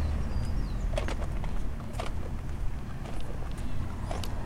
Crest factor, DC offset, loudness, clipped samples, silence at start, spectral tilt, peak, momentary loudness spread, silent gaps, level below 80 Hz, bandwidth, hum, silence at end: 14 dB; under 0.1%; -36 LUFS; under 0.1%; 0 s; -6.5 dB/octave; -16 dBFS; 6 LU; none; -34 dBFS; 13 kHz; none; 0 s